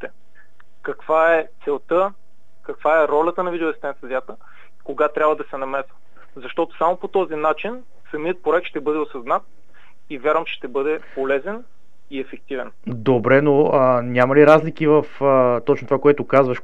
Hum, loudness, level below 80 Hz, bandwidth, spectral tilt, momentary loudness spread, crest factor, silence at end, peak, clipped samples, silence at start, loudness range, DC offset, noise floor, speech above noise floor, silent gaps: none; -19 LUFS; -66 dBFS; 7.6 kHz; -8 dB/octave; 16 LU; 20 dB; 0.05 s; 0 dBFS; under 0.1%; 0 s; 9 LU; 2%; -56 dBFS; 37 dB; none